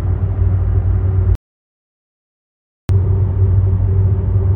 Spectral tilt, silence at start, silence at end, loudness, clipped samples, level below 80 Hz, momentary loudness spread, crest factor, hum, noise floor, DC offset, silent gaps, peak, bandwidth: -11 dB/octave; 0 s; 0 s; -16 LUFS; under 0.1%; -22 dBFS; 4 LU; 12 dB; none; under -90 dBFS; under 0.1%; 1.35-2.88 s; -4 dBFS; 2.2 kHz